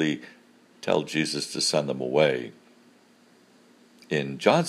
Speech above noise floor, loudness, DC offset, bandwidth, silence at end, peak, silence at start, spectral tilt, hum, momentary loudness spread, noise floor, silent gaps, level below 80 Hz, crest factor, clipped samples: 33 dB; -26 LUFS; under 0.1%; 15.5 kHz; 0 s; -4 dBFS; 0 s; -4 dB/octave; none; 11 LU; -58 dBFS; none; -70 dBFS; 24 dB; under 0.1%